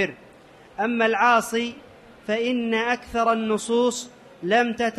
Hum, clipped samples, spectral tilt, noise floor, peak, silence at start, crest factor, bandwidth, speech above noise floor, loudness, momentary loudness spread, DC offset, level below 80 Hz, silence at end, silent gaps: none; under 0.1%; -3.5 dB/octave; -49 dBFS; -6 dBFS; 0 s; 18 dB; 13 kHz; 27 dB; -23 LUFS; 14 LU; under 0.1%; -58 dBFS; 0 s; none